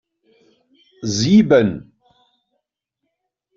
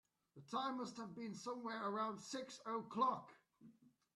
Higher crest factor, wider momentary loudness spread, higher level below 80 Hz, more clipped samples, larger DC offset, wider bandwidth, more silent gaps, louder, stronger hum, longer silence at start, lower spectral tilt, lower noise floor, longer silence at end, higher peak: about the same, 18 dB vs 20 dB; first, 17 LU vs 10 LU; first, -54 dBFS vs under -90 dBFS; neither; neither; second, 7.6 kHz vs 12.5 kHz; neither; first, -15 LUFS vs -45 LUFS; neither; first, 1 s vs 0.35 s; about the same, -5.5 dB/octave vs -4.5 dB/octave; first, -77 dBFS vs -68 dBFS; first, 1.75 s vs 0.3 s; first, -2 dBFS vs -26 dBFS